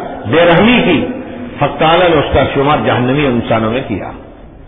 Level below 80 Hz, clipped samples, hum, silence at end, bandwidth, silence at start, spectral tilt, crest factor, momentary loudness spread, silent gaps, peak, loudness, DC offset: -32 dBFS; under 0.1%; none; 0 s; 3.9 kHz; 0 s; -10 dB/octave; 12 dB; 13 LU; none; 0 dBFS; -11 LUFS; under 0.1%